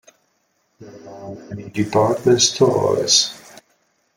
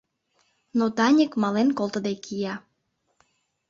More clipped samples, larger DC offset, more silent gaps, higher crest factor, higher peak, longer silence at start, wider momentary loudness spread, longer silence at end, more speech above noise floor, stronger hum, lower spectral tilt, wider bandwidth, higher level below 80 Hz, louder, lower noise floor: neither; neither; neither; about the same, 18 dB vs 18 dB; first, -2 dBFS vs -8 dBFS; about the same, 0.8 s vs 0.75 s; first, 22 LU vs 11 LU; second, 0.8 s vs 1.1 s; about the same, 48 dB vs 51 dB; neither; second, -3.5 dB/octave vs -5.5 dB/octave; first, 16.5 kHz vs 7.6 kHz; first, -58 dBFS vs -70 dBFS; first, -16 LUFS vs -24 LUFS; second, -66 dBFS vs -74 dBFS